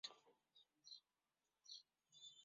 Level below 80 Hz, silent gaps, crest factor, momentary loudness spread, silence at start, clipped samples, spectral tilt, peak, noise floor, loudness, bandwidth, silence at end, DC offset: under -90 dBFS; none; 26 dB; 8 LU; 0.05 s; under 0.1%; 2.5 dB/octave; -38 dBFS; under -90 dBFS; -62 LUFS; 7.4 kHz; 0 s; under 0.1%